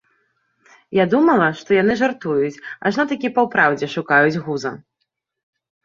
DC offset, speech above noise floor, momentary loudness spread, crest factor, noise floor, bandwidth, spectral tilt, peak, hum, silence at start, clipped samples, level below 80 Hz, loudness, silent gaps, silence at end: under 0.1%; 58 dB; 9 LU; 18 dB; -75 dBFS; 7.4 kHz; -6.5 dB/octave; -2 dBFS; none; 0.9 s; under 0.1%; -60 dBFS; -18 LUFS; none; 1.05 s